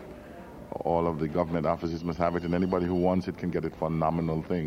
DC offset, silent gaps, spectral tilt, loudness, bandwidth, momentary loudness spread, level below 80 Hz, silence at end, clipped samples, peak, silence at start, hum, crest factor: under 0.1%; none; -9 dB/octave; -29 LUFS; 7 kHz; 13 LU; -50 dBFS; 0 s; under 0.1%; -10 dBFS; 0 s; none; 18 dB